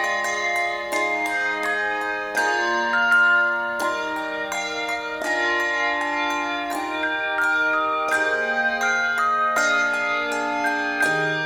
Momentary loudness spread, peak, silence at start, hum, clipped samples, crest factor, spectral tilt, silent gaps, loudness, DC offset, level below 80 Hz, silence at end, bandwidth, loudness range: 6 LU; -8 dBFS; 0 s; none; under 0.1%; 14 dB; -2 dB/octave; none; -21 LUFS; under 0.1%; -60 dBFS; 0 s; 17 kHz; 3 LU